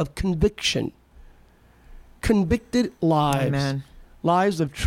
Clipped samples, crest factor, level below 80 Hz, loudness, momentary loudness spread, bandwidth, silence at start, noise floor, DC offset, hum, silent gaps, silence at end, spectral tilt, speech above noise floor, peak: under 0.1%; 16 dB; -40 dBFS; -23 LUFS; 7 LU; 16.5 kHz; 0 s; -54 dBFS; under 0.1%; none; none; 0 s; -5.5 dB/octave; 32 dB; -6 dBFS